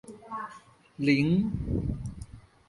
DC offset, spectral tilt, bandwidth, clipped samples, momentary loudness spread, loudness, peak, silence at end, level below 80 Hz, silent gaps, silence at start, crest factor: under 0.1%; -7.5 dB/octave; 11.5 kHz; under 0.1%; 19 LU; -29 LUFS; -12 dBFS; 0.3 s; -44 dBFS; none; 0.05 s; 20 dB